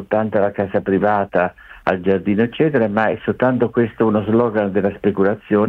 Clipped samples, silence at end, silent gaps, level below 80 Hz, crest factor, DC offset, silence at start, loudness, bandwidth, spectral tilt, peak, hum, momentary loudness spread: under 0.1%; 0 s; none; -52 dBFS; 14 dB; under 0.1%; 0 s; -18 LUFS; 4.8 kHz; -9.5 dB/octave; -2 dBFS; none; 4 LU